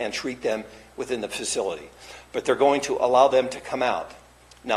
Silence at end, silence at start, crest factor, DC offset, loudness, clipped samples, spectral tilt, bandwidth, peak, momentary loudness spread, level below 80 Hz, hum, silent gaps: 0 s; 0 s; 20 dB; under 0.1%; -24 LUFS; under 0.1%; -3 dB/octave; 13 kHz; -4 dBFS; 21 LU; -58 dBFS; none; none